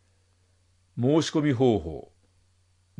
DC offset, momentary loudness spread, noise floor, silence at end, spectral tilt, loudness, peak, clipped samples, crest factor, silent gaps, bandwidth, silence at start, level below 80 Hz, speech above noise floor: under 0.1%; 18 LU; -65 dBFS; 1 s; -6.5 dB/octave; -24 LUFS; -10 dBFS; under 0.1%; 18 dB; none; 11 kHz; 0.95 s; -56 dBFS; 41 dB